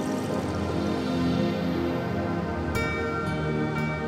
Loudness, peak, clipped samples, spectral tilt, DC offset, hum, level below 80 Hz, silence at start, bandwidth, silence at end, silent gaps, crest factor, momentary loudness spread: -28 LUFS; -12 dBFS; under 0.1%; -6.5 dB/octave; under 0.1%; none; -44 dBFS; 0 s; 15.5 kHz; 0 s; none; 14 dB; 3 LU